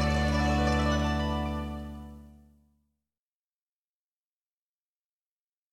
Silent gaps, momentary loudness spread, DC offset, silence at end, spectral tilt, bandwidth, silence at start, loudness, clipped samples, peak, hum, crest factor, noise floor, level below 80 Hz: none; 16 LU; under 0.1%; 3.4 s; -6 dB/octave; 12 kHz; 0 s; -28 LUFS; under 0.1%; -16 dBFS; none; 16 dB; under -90 dBFS; -38 dBFS